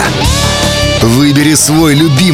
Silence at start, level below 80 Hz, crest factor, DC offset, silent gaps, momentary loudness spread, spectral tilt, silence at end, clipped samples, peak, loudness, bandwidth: 0 s; -22 dBFS; 8 dB; under 0.1%; none; 3 LU; -4 dB/octave; 0 s; under 0.1%; 0 dBFS; -8 LUFS; 17.5 kHz